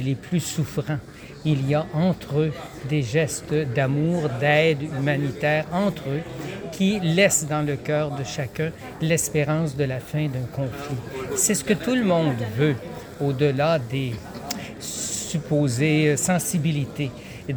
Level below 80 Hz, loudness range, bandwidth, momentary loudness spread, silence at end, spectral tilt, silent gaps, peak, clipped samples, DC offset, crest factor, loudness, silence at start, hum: -52 dBFS; 3 LU; over 20 kHz; 11 LU; 0 s; -5 dB/octave; none; -4 dBFS; under 0.1%; under 0.1%; 18 dB; -24 LUFS; 0 s; none